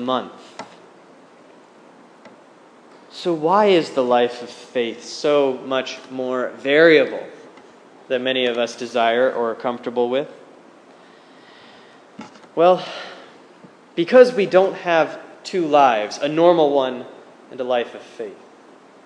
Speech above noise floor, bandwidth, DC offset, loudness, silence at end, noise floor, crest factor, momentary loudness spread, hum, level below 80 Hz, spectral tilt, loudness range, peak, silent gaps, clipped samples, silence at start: 30 dB; 10 kHz; under 0.1%; -18 LUFS; 0.7 s; -48 dBFS; 20 dB; 20 LU; none; -84 dBFS; -5 dB/octave; 7 LU; 0 dBFS; none; under 0.1%; 0 s